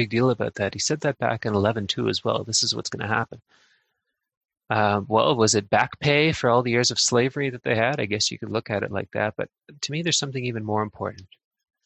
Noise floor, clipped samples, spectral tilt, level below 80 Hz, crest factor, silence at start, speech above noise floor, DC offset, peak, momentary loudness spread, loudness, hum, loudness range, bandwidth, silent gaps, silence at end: -79 dBFS; under 0.1%; -3.5 dB/octave; -54 dBFS; 20 dB; 0 s; 55 dB; under 0.1%; -4 dBFS; 9 LU; -23 LUFS; none; 5 LU; 9.6 kHz; 4.37-4.41 s; 0.6 s